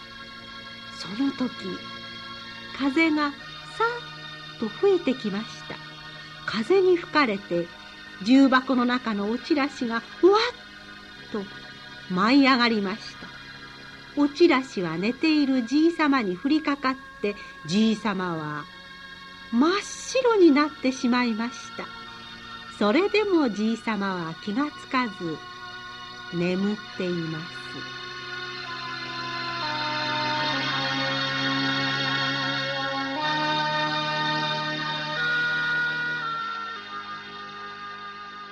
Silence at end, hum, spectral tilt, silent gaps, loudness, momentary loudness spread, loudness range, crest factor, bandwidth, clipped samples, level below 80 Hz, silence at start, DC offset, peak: 0 s; none; -5 dB/octave; none; -25 LUFS; 18 LU; 6 LU; 20 dB; 10.5 kHz; under 0.1%; -62 dBFS; 0 s; under 0.1%; -6 dBFS